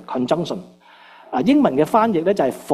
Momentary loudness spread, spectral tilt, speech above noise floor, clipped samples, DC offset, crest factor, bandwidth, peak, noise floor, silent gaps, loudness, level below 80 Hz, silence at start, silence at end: 11 LU; -6.5 dB/octave; 28 dB; under 0.1%; under 0.1%; 18 dB; 14 kHz; -2 dBFS; -46 dBFS; none; -18 LUFS; -58 dBFS; 0.1 s; 0 s